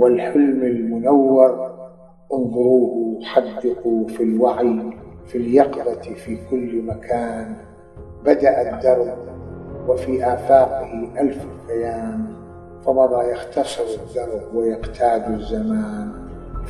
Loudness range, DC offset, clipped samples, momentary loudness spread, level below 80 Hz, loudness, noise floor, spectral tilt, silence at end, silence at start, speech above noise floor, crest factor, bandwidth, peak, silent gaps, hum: 4 LU; under 0.1%; under 0.1%; 16 LU; -42 dBFS; -19 LUFS; -41 dBFS; -7 dB/octave; 0 s; 0 s; 22 dB; 20 dB; 11.5 kHz; 0 dBFS; none; none